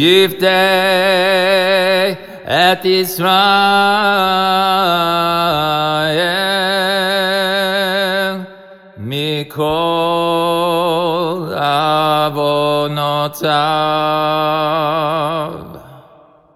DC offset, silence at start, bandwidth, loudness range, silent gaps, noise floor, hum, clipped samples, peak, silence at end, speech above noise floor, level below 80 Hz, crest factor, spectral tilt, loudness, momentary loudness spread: 0.3%; 0 s; 16.5 kHz; 5 LU; none; -45 dBFS; none; under 0.1%; 0 dBFS; 0.55 s; 32 dB; -54 dBFS; 14 dB; -4.5 dB/octave; -14 LUFS; 7 LU